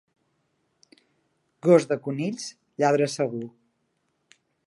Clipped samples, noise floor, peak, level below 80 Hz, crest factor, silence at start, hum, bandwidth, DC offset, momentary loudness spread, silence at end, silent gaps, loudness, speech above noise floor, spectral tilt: under 0.1%; -74 dBFS; -6 dBFS; -78 dBFS; 22 dB; 1.65 s; none; 11.5 kHz; under 0.1%; 17 LU; 1.15 s; none; -24 LUFS; 51 dB; -6 dB/octave